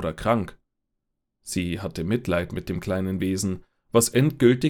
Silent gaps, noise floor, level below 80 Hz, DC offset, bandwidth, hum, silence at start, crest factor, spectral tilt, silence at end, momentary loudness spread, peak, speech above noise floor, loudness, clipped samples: none; -79 dBFS; -48 dBFS; under 0.1%; 18.5 kHz; none; 0 s; 20 dB; -5.5 dB/octave; 0 s; 11 LU; -6 dBFS; 56 dB; -25 LUFS; under 0.1%